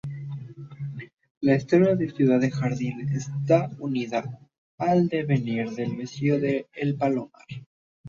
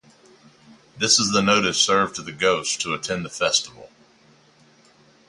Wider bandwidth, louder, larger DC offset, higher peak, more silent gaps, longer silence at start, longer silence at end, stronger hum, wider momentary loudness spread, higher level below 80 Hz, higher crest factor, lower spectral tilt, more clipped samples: second, 7.4 kHz vs 11.5 kHz; second, -25 LUFS vs -20 LUFS; neither; second, -8 dBFS vs -4 dBFS; first, 1.30-1.41 s, 4.58-4.78 s, 7.66-8.04 s vs none; second, 0.05 s vs 0.95 s; second, 0 s vs 1.4 s; neither; first, 17 LU vs 9 LU; about the same, -62 dBFS vs -58 dBFS; about the same, 18 dB vs 20 dB; first, -8 dB/octave vs -2 dB/octave; neither